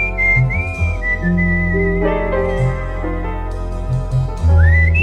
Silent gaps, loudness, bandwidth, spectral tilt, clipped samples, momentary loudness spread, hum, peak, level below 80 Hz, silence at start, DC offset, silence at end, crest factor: none; -17 LUFS; 8 kHz; -8.5 dB/octave; under 0.1%; 11 LU; none; -2 dBFS; -22 dBFS; 0 s; under 0.1%; 0 s; 12 dB